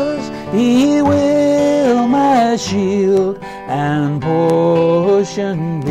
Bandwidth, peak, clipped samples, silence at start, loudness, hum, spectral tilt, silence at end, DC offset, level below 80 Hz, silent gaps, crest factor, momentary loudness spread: 12.5 kHz; -4 dBFS; under 0.1%; 0 s; -14 LUFS; none; -6.5 dB/octave; 0 s; under 0.1%; -48 dBFS; none; 8 dB; 8 LU